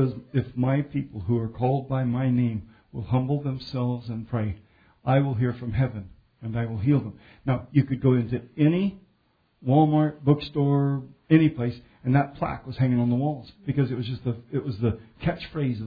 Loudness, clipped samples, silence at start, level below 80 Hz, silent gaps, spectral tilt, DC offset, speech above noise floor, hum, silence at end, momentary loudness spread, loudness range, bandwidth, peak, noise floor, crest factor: -26 LUFS; under 0.1%; 0 s; -50 dBFS; none; -11 dB/octave; under 0.1%; 43 dB; none; 0 s; 10 LU; 4 LU; 5 kHz; -4 dBFS; -67 dBFS; 22 dB